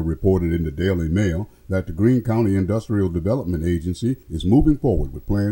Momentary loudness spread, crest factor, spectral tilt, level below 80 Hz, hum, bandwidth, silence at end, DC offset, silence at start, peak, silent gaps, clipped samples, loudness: 7 LU; 16 dB; -8.5 dB/octave; -32 dBFS; none; 16.5 kHz; 0 s; under 0.1%; 0 s; -4 dBFS; none; under 0.1%; -21 LUFS